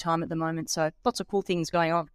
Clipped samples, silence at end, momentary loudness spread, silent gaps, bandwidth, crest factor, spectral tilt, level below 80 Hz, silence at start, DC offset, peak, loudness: under 0.1%; 0.1 s; 5 LU; none; 15.5 kHz; 16 dB; -4.5 dB/octave; -58 dBFS; 0 s; under 0.1%; -12 dBFS; -28 LUFS